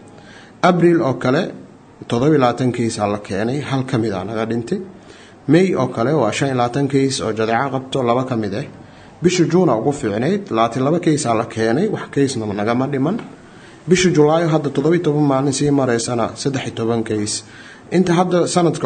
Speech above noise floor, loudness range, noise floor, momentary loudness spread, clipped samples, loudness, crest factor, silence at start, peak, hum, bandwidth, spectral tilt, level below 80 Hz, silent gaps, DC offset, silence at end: 25 dB; 3 LU; -41 dBFS; 9 LU; under 0.1%; -18 LUFS; 18 dB; 0 s; 0 dBFS; none; 9.4 kHz; -6 dB/octave; -54 dBFS; none; under 0.1%; 0 s